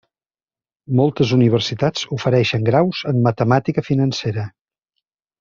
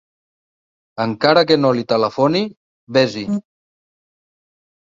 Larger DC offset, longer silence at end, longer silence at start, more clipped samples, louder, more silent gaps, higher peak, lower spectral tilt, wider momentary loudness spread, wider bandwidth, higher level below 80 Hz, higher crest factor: neither; second, 0.9 s vs 1.45 s; about the same, 0.9 s vs 0.95 s; neither; about the same, -18 LUFS vs -17 LUFS; second, none vs 2.57-2.87 s; about the same, -2 dBFS vs 0 dBFS; about the same, -7 dB/octave vs -6 dB/octave; second, 7 LU vs 12 LU; about the same, 7.4 kHz vs 7.6 kHz; first, -54 dBFS vs -60 dBFS; about the same, 16 dB vs 20 dB